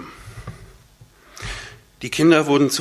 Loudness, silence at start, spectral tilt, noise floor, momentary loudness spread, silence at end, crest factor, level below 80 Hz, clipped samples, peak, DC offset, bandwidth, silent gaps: -18 LUFS; 0 s; -4.5 dB/octave; -50 dBFS; 23 LU; 0 s; 22 dB; -46 dBFS; under 0.1%; 0 dBFS; under 0.1%; 15 kHz; none